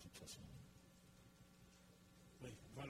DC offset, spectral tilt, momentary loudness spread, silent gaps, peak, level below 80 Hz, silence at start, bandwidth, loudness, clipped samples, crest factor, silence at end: under 0.1%; -4.5 dB/octave; 11 LU; none; -38 dBFS; -72 dBFS; 0 s; 16 kHz; -61 LUFS; under 0.1%; 22 dB; 0 s